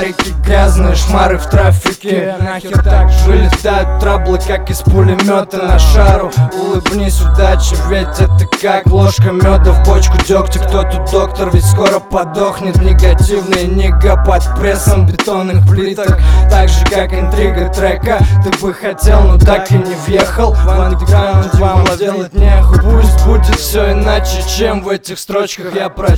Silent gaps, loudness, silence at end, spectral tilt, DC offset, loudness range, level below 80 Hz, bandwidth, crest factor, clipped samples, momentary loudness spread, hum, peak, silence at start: none; -11 LUFS; 0 s; -6 dB/octave; under 0.1%; 1 LU; -12 dBFS; 15.5 kHz; 8 dB; 0.3%; 6 LU; none; 0 dBFS; 0 s